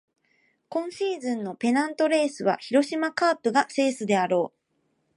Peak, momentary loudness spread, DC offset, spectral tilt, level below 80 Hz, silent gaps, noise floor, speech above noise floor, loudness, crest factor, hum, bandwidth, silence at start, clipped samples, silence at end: -8 dBFS; 7 LU; under 0.1%; -4.5 dB/octave; -80 dBFS; none; -72 dBFS; 48 dB; -25 LUFS; 18 dB; none; 11.5 kHz; 0.7 s; under 0.1%; 0.7 s